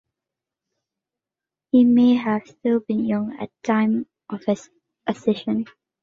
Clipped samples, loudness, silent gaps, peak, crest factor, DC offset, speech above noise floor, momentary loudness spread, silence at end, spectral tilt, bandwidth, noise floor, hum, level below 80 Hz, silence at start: under 0.1%; -21 LUFS; none; -6 dBFS; 16 dB; under 0.1%; 69 dB; 14 LU; 0.4 s; -7 dB/octave; 7.4 kHz; -89 dBFS; none; -66 dBFS; 1.75 s